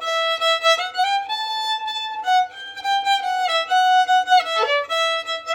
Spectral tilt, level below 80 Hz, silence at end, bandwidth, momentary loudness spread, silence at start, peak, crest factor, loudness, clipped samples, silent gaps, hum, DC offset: 2 dB/octave; -70 dBFS; 0 s; 16 kHz; 8 LU; 0 s; -4 dBFS; 16 dB; -19 LUFS; under 0.1%; none; none; under 0.1%